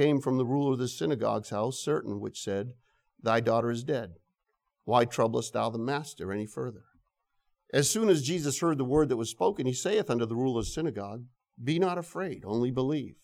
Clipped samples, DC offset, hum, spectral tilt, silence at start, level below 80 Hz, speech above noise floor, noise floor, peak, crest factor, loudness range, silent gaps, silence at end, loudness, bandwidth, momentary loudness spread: under 0.1%; under 0.1%; none; -5 dB/octave; 0 s; -56 dBFS; 52 dB; -81 dBFS; -10 dBFS; 20 dB; 4 LU; none; 0.1 s; -30 LUFS; 16 kHz; 10 LU